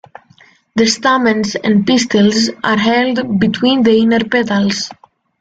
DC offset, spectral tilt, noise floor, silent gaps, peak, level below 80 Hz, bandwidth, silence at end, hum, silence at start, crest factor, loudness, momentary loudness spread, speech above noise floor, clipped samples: under 0.1%; -4.5 dB/octave; -48 dBFS; none; 0 dBFS; -52 dBFS; 9 kHz; 0.5 s; none; 0.75 s; 12 dB; -13 LUFS; 5 LU; 35 dB; under 0.1%